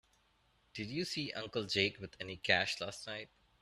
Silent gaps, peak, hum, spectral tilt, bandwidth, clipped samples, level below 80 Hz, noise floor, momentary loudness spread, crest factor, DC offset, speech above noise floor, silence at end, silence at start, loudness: none; -14 dBFS; none; -3.5 dB/octave; 14 kHz; under 0.1%; -70 dBFS; -73 dBFS; 15 LU; 26 dB; under 0.1%; 35 dB; 0.35 s; 0.75 s; -37 LUFS